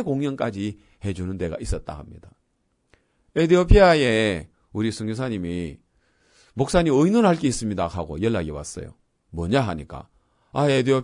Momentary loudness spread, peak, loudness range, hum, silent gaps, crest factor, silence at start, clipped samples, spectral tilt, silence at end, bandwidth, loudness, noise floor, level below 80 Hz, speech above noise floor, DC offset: 19 LU; -2 dBFS; 6 LU; none; none; 20 dB; 0 s; under 0.1%; -6 dB/octave; 0 s; 11 kHz; -22 LUFS; -70 dBFS; -34 dBFS; 49 dB; under 0.1%